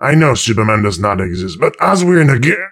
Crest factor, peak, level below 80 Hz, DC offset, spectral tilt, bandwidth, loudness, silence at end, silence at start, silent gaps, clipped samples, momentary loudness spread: 12 dB; 0 dBFS; -40 dBFS; under 0.1%; -5.5 dB/octave; 14 kHz; -12 LUFS; 0 s; 0 s; none; under 0.1%; 6 LU